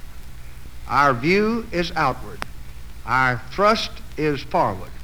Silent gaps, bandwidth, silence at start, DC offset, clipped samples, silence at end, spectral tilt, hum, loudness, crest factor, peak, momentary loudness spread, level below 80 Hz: none; over 20 kHz; 0 s; 2%; under 0.1%; 0 s; -5.5 dB/octave; none; -21 LUFS; 18 dB; -4 dBFS; 23 LU; -38 dBFS